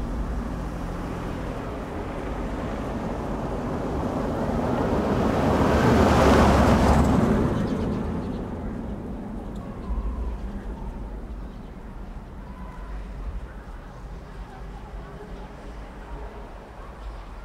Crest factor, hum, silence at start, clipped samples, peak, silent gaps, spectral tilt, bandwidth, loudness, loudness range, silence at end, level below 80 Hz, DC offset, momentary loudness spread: 22 dB; none; 0 s; under 0.1%; -4 dBFS; none; -7 dB/octave; 15 kHz; -25 LUFS; 19 LU; 0 s; -32 dBFS; under 0.1%; 22 LU